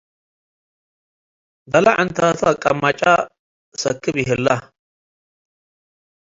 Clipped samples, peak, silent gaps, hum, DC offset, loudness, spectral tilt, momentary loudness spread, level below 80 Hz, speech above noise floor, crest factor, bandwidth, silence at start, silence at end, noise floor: under 0.1%; 0 dBFS; 3.39-3.72 s; none; under 0.1%; -17 LUFS; -4.5 dB/octave; 9 LU; -54 dBFS; over 73 dB; 20 dB; 7.8 kHz; 1.7 s; 1.8 s; under -90 dBFS